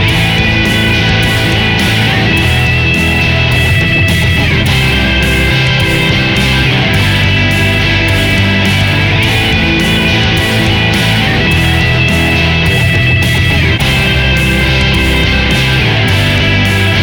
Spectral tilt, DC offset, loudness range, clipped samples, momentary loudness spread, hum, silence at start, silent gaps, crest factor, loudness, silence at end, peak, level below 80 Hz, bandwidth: -5 dB/octave; under 0.1%; 0 LU; under 0.1%; 1 LU; none; 0 s; none; 8 dB; -9 LUFS; 0 s; 0 dBFS; -20 dBFS; over 20 kHz